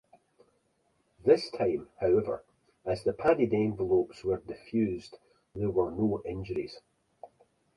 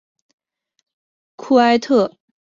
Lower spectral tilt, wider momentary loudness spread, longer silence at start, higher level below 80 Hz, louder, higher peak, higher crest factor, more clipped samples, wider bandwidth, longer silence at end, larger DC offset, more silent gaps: first, -7.5 dB/octave vs -5 dB/octave; about the same, 11 LU vs 12 LU; second, 1.25 s vs 1.4 s; first, -58 dBFS vs -64 dBFS; second, -30 LUFS vs -16 LUFS; second, -10 dBFS vs -2 dBFS; about the same, 22 dB vs 18 dB; neither; first, 11.5 kHz vs 7.6 kHz; first, 0.5 s vs 0.35 s; neither; neither